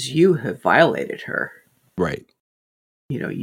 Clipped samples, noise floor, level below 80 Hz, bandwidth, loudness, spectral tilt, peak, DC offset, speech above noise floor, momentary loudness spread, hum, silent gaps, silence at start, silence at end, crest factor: under 0.1%; under -90 dBFS; -56 dBFS; 16 kHz; -20 LUFS; -6 dB/octave; -2 dBFS; under 0.1%; over 70 dB; 16 LU; none; 2.40-3.09 s; 0 s; 0 s; 20 dB